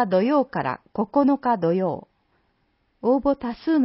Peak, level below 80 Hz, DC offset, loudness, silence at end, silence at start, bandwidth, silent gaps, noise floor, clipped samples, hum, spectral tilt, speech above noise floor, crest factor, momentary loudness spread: -8 dBFS; -56 dBFS; under 0.1%; -23 LUFS; 0 s; 0 s; 5.8 kHz; none; -68 dBFS; under 0.1%; none; -11.5 dB/octave; 47 dB; 14 dB; 8 LU